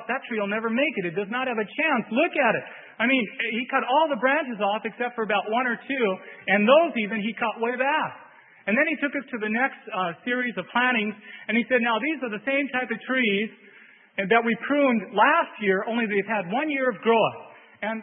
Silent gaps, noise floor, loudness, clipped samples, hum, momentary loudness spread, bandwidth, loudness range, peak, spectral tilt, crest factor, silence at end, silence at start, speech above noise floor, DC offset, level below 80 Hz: none; -52 dBFS; -24 LUFS; under 0.1%; none; 8 LU; 3.9 kHz; 3 LU; -6 dBFS; -9.5 dB/octave; 20 dB; 0 s; 0 s; 28 dB; under 0.1%; -78 dBFS